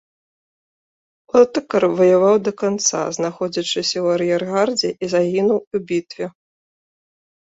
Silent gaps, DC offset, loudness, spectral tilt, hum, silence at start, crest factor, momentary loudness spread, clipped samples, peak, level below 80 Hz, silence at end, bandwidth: 5.67-5.71 s; under 0.1%; -18 LUFS; -4 dB/octave; none; 1.35 s; 18 dB; 9 LU; under 0.1%; -2 dBFS; -62 dBFS; 1.1 s; 8 kHz